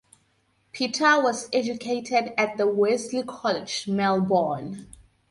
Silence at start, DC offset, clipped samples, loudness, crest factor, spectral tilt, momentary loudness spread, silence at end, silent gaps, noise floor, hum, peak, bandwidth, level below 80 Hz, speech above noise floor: 0.75 s; under 0.1%; under 0.1%; -24 LUFS; 18 dB; -4 dB/octave; 10 LU; 0.45 s; none; -67 dBFS; none; -8 dBFS; 11.5 kHz; -64 dBFS; 43 dB